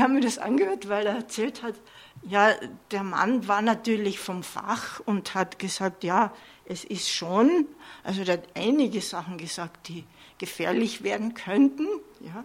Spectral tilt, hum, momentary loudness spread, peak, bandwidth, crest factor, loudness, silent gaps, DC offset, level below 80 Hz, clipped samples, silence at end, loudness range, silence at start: -4.5 dB/octave; none; 15 LU; -6 dBFS; 16 kHz; 22 dB; -26 LUFS; none; under 0.1%; -68 dBFS; under 0.1%; 0 s; 3 LU; 0 s